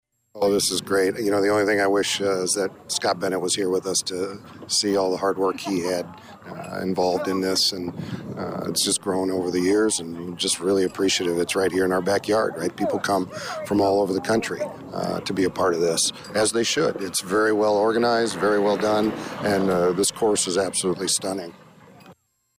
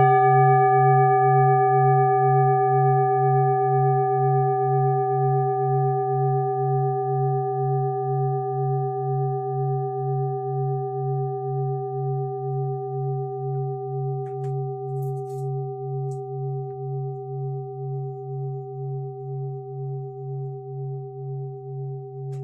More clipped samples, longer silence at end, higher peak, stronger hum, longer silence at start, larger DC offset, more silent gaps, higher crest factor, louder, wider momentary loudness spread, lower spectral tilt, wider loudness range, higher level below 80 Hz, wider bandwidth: neither; first, 0.45 s vs 0 s; second, -12 dBFS vs -6 dBFS; neither; first, 0.35 s vs 0 s; neither; neither; about the same, 12 dB vs 16 dB; about the same, -22 LUFS vs -23 LUFS; second, 10 LU vs 15 LU; second, -3 dB/octave vs -11.5 dB/octave; second, 3 LU vs 13 LU; first, -60 dBFS vs -76 dBFS; first, 16 kHz vs 2.4 kHz